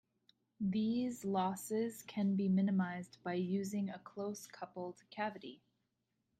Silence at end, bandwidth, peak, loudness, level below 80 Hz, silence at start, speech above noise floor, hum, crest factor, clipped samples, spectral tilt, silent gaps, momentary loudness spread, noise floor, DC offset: 0.85 s; 15.5 kHz; -24 dBFS; -39 LUFS; -80 dBFS; 0.6 s; 47 dB; none; 16 dB; under 0.1%; -6.5 dB/octave; none; 14 LU; -85 dBFS; under 0.1%